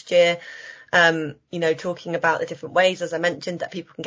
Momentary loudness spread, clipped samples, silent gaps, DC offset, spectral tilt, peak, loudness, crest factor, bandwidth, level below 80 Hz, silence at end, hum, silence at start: 14 LU; under 0.1%; none; under 0.1%; -4 dB/octave; -4 dBFS; -22 LUFS; 20 dB; 7.8 kHz; -68 dBFS; 0 s; none; 0.05 s